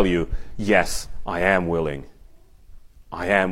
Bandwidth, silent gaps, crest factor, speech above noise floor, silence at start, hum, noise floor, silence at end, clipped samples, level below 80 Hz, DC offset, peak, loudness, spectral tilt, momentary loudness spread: 16 kHz; none; 20 dB; 26 dB; 0 s; none; -47 dBFS; 0 s; under 0.1%; -36 dBFS; under 0.1%; -4 dBFS; -23 LUFS; -5 dB/octave; 12 LU